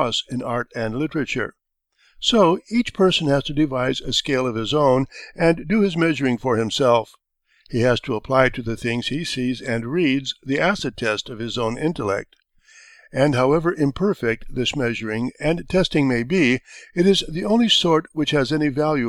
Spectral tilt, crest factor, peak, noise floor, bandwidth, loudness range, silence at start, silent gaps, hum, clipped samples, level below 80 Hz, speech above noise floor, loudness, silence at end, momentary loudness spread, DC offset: -5 dB/octave; 20 dB; 0 dBFS; -63 dBFS; 12.5 kHz; 4 LU; 0 s; none; none; under 0.1%; -44 dBFS; 42 dB; -21 LUFS; 0 s; 8 LU; under 0.1%